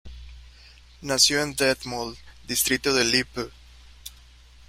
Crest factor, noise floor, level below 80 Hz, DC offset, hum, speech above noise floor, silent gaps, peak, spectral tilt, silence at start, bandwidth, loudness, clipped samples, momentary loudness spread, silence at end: 22 dB; -50 dBFS; -48 dBFS; under 0.1%; none; 26 dB; none; -4 dBFS; -2 dB/octave; 0.05 s; 16 kHz; -22 LUFS; under 0.1%; 24 LU; 0.6 s